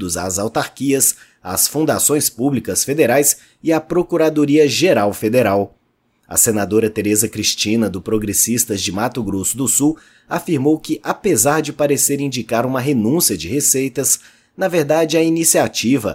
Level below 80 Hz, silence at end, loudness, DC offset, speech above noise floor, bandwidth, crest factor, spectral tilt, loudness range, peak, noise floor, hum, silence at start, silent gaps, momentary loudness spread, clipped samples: -50 dBFS; 0 s; -16 LUFS; under 0.1%; 46 dB; 16.5 kHz; 16 dB; -3.5 dB/octave; 2 LU; 0 dBFS; -62 dBFS; none; 0 s; none; 7 LU; under 0.1%